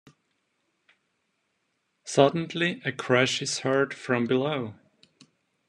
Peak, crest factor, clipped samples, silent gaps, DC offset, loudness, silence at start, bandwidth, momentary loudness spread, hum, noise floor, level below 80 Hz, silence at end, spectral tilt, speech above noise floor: -4 dBFS; 24 dB; under 0.1%; none; under 0.1%; -25 LUFS; 2.05 s; 11.5 kHz; 10 LU; none; -76 dBFS; -72 dBFS; 0.95 s; -4.5 dB/octave; 51 dB